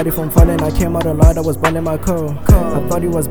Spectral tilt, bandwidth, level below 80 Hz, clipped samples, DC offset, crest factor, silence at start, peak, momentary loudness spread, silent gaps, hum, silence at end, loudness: -7 dB/octave; over 20 kHz; -18 dBFS; 0.6%; 4%; 14 dB; 0 s; 0 dBFS; 6 LU; none; none; 0 s; -15 LUFS